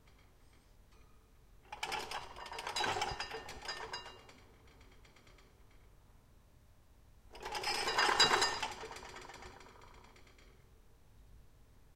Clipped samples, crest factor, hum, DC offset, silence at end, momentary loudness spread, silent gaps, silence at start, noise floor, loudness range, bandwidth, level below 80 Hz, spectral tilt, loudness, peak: under 0.1%; 28 dB; none; under 0.1%; 0 s; 29 LU; none; 0.05 s; -63 dBFS; 16 LU; 16.5 kHz; -62 dBFS; -1 dB/octave; -36 LUFS; -14 dBFS